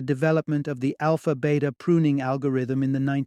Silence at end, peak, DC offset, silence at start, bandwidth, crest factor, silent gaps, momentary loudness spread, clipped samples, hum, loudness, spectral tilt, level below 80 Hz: 0 s; -8 dBFS; under 0.1%; 0 s; 11 kHz; 14 dB; none; 4 LU; under 0.1%; none; -24 LUFS; -8.5 dB/octave; -64 dBFS